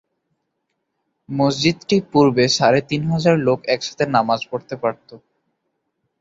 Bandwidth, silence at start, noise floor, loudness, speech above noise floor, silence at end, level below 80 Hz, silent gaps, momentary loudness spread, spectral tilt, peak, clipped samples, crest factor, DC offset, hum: 8 kHz; 1.3 s; -74 dBFS; -18 LUFS; 56 dB; 1.05 s; -56 dBFS; none; 10 LU; -5.5 dB/octave; -2 dBFS; under 0.1%; 18 dB; under 0.1%; none